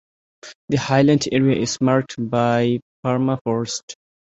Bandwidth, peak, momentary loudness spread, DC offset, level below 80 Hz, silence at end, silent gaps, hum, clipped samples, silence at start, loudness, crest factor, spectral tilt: 8.2 kHz; -2 dBFS; 11 LU; under 0.1%; -54 dBFS; 0.4 s; 0.55-0.68 s, 2.82-3.03 s, 3.41-3.45 s, 3.83-3.88 s; none; under 0.1%; 0.45 s; -20 LUFS; 18 dB; -5.5 dB/octave